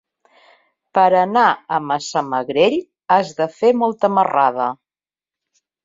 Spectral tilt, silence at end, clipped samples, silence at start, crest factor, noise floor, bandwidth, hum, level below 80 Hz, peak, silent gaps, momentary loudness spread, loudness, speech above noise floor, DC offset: -5 dB/octave; 1.1 s; under 0.1%; 0.95 s; 16 dB; under -90 dBFS; 7.8 kHz; none; -66 dBFS; -2 dBFS; none; 9 LU; -17 LUFS; over 74 dB; under 0.1%